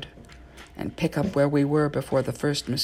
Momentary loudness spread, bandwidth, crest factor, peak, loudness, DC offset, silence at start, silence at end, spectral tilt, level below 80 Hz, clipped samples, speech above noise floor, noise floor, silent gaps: 14 LU; 15.5 kHz; 16 dB; -10 dBFS; -25 LUFS; under 0.1%; 0 s; 0 s; -6 dB/octave; -50 dBFS; under 0.1%; 22 dB; -47 dBFS; none